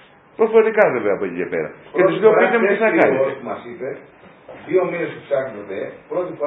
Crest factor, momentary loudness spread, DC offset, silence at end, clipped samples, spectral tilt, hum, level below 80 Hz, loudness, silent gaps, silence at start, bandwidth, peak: 18 dB; 16 LU; under 0.1%; 0 s; under 0.1%; -9 dB/octave; none; -64 dBFS; -18 LUFS; none; 0.4 s; 4 kHz; 0 dBFS